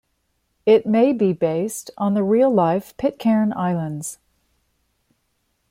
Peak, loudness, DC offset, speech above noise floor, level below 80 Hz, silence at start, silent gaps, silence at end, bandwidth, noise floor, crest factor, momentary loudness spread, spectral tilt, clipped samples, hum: -4 dBFS; -20 LUFS; under 0.1%; 51 dB; -60 dBFS; 0.65 s; none; 1.55 s; 16 kHz; -70 dBFS; 16 dB; 10 LU; -6.5 dB/octave; under 0.1%; none